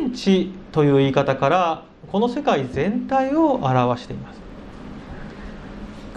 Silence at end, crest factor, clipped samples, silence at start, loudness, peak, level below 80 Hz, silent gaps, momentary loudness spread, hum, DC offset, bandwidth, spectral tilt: 0 s; 18 dB; under 0.1%; 0 s; -20 LUFS; -2 dBFS; -44 dBFS; none; 19 LU; none; under 0.1%; 9.4 kHz; -7 dB/octave